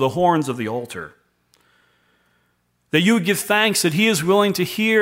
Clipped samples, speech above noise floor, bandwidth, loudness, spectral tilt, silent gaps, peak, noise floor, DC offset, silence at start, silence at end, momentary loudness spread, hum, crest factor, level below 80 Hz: under 0.1%; 48 dB; 16.5 kHz; -18 LUFS; -4 dB/octave; none; -2 dBFS; -66 dBFS; under 0.1%; 0 s; 0 s; 12 LU; 60 Hz at -50 dBFS; 18 dB; -60 dBFS